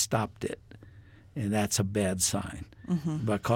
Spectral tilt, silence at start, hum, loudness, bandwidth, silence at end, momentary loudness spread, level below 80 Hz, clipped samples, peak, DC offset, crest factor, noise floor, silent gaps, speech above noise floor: -4.5 dB/octave; 0 s; none; -30 LUFS; 17 kHz; 0 s; 14 LU; -54 dBFS; under 0.1%; -14 dBFS; under 0.1%; 18 dB; -53 dBFS; none; 23 dB